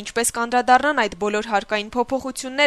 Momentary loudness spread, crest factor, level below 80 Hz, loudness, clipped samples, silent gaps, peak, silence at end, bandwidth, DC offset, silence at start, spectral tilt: 8 LU; 18 dB; -52 dBFS; -21 LUFS; under 0.1%; none; -2 dBFS; 0 s; 13.5 kHz; under 0.1%; 0 s; -2 dB/octave